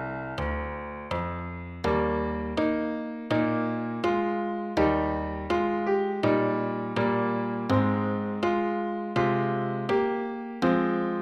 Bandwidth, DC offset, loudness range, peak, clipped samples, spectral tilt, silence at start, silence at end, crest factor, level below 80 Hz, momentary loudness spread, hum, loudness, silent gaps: 9.8 kHz; under 0.1%; 2 LU; -10 dBFS; under 0.1%; -8 dB/octave; 0 s; 0 s; 16 dB; -46 dBFS; 7 LU; none; -28 LUFS; none